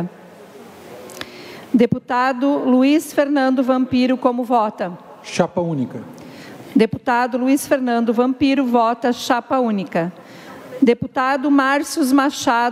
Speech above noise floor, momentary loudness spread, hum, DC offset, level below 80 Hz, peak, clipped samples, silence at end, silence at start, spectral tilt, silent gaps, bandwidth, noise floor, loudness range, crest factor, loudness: 24 dB; 19 LU; none; under 0.1%; -58 dBFS; -2 dBFS; under 0.1%; 0 s; 0 s; -5 dB/octave; none; 15 kHz; -41 dBFS; 3 LU; 16 dB; -18 LUFS